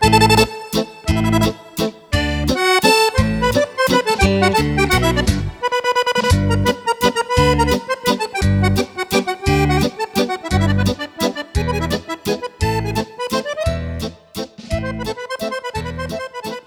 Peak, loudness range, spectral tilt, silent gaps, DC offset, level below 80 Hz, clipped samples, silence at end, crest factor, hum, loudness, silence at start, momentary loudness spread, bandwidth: 0 dBFS; 7 LU; -5 dB/octave; none; under 0.1%; -28 dBFS; under 0.1%; 0.05 s; 18 dB; none; -18 LUFS; 0 s; 11 LU; over 20 kHz